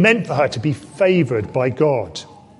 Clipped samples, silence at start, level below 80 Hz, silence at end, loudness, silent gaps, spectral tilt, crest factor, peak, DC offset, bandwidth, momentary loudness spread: under 0.1%; 0 s; -50 dBFS; 0.25 s; -18 LUFS; none; -6.5 dB/octave; 18 dB; -2 dBFS; under 0.1%; 11.5 kHz; 8 LU